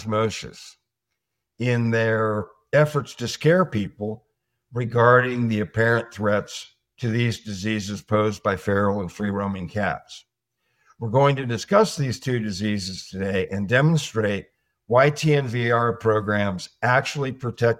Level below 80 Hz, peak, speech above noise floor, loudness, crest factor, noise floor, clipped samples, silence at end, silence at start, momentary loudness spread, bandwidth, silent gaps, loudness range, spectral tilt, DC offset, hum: -58 dBFS; -2 dBFS; 59 dB; -22 LUFS; 20 dB; -81 dBFS; under 0.1%; 0.05 s; 0 s; 11 LU; 14.5 kHz; none; 3 LU; -6 dB/octave; under 0.1%; none